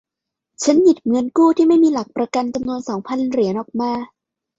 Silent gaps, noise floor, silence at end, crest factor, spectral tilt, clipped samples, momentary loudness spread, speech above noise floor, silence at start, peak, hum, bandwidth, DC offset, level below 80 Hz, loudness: none; -83 dBFS; 0.55 s; 16 dB; -5.5 dB/octave; under 0.1%; 11 LU; 67 dB; 0.6 s; -2 dBFS; none; 8 kHz; under 0.1%; -58 dBFS; -18 LUFS